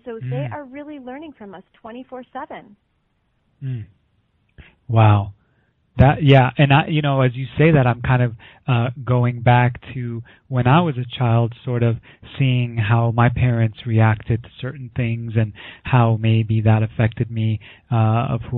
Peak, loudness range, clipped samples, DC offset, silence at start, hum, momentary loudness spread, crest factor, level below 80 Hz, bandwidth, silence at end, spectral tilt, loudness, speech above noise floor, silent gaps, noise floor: -2 dBFS; 17 LU; under 0.1%; under 0.1%; 0.05 s; none; 19 LU; 18 dB; -42 dBFS; 4.1 kHz; 0 s; -6.5 dB/octave; -18 LUFS; 48 dB; none; -66 dBFS